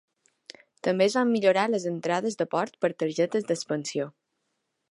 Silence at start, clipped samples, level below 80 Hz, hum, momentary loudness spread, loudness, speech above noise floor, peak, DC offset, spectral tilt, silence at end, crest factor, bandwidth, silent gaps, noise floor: 0.85 s; under 0.1%; -80 dBFS; none; 8 LU; -26 LUFS; 53 dB; -10 dBFS; under 0.1%; -5 dB/octave; 0.85 s; 18 dB; 11.5 kHz; none; -79 dBFS